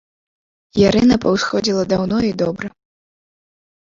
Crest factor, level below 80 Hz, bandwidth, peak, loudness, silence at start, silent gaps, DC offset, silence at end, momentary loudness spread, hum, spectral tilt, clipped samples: 18 dB; -44 dBFS; 7.6 kHz; -2 dBFS; -17 LUFS; 0.75 s; none; under 0.1%; 1.3 s; 11 LU; none; -5.5 dB/octave; under 0.1%